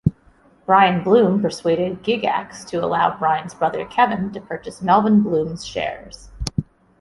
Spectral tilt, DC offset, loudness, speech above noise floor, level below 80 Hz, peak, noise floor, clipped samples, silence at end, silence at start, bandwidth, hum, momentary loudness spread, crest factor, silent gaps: -6 dB/octave; under 0.1%; -19 LUFS; 35 dB; -44 dBFS; -2 dBFS; -53 dBFS; under 0.1%; 0.4 s; 0.05 s; 11.5 kHz; none; 13 LU; 18 dB; none